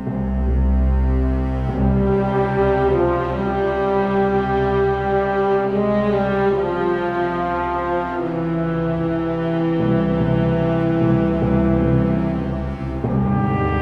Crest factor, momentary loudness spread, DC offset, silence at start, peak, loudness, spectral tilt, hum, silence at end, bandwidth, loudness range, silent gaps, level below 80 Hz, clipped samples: 12 dB; 5 LU; under 0.1%; 0 s; -6 dBFS; -19 LUFS; -9.5 dB/octave; none; 0 s; 5.8 kHz; 2 LU; none; -26 dBFS; under 0.1%